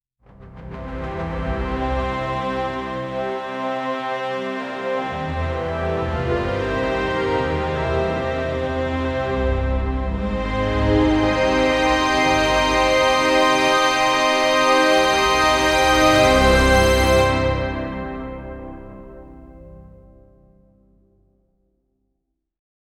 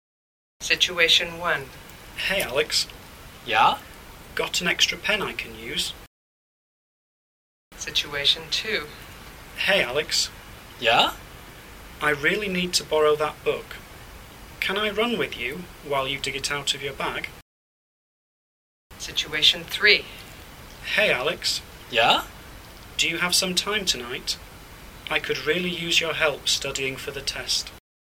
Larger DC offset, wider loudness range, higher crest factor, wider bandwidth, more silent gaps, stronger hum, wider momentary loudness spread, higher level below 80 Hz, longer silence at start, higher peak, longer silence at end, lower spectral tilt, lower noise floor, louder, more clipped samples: neither; first, 10 LU vs 5 LU; second, 18 dB vs 24 dB; second, 16 kHz vs 19 kHz; second, none vs 6.07-7.71 s, 17.42-18.90 s; neither; second, 13 LU vs 23 LU; first, -30 dBFS vs -50 dBFS; second, 0.4 s vs 0.6 s; about the same, -2 dBFS vs -2 dBFS; first, 3.1 s vs 0.35 s; first, -4.5 dB/octave vs -1.5 dB/octave; second, -75 dBFS vs under -90 dBFS; first, -19 LUFS vs -23 LUFS; neither